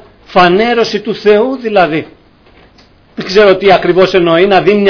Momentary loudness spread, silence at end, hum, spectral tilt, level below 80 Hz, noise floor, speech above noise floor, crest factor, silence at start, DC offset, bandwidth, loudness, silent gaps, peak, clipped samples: 7 LU; 0 s; none; -6 dB/octave; -42 dBFS; -43 dBFS; 35 dB; 10 dB; 0.3 s; under 0.1%; 5.4 kHz; -9 LUFS; none; 0 dBFS; 0.7%